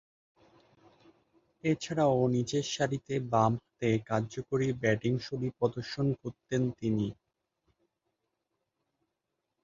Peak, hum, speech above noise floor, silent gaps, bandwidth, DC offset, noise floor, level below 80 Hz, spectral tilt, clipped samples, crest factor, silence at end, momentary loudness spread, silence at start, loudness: -12 dBFS; none; 54 dB; none; 7.8 kHz; under 0.1%; -85 dBFS; -62 dBFS; -6.5 dB/octave; under 0.1%; 20 dB; 2.5 s; 6 LU; 1.65 s; -31 LUFS